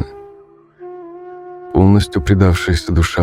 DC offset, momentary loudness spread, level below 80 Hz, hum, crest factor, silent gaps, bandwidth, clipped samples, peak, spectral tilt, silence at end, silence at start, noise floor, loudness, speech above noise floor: under 0.1%; 22 LU; -30 dBFS; none; 16 dB; none; 13.5 kHz; under 0.1%; 0 dBFS; -6.5 dB/octave; 0 s; 0 s; -44 dBFS; -14 LUFS; 31 dB